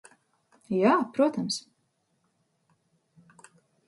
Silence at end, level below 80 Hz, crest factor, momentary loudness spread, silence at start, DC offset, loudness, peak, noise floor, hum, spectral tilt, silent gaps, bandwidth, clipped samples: 2.3 s; -78 dBFS; 22 dB; 9 LU; 0.7 s; under 0.1%; -26 LUFS; -10 dBFS; -74 dBFS; none; -5 dB/octave; none; 11.5 kHz; under 0.1%